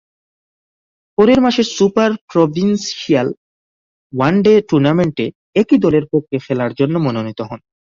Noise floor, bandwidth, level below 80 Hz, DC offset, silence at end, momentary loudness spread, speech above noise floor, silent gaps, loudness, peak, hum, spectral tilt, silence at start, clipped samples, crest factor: under -90 dBFS; 7.6 kHz; -50 dBFS; under 0.1%; 0.35 s; 12 LU; over 76 dB; 2.21-2.28 s, 3.37-4.10 s, 5.35-5.53 s; -15 LUFS; -2 dBFS; none; -6.5 dB/octave; 1.2 s; under 0.1%; 14 dB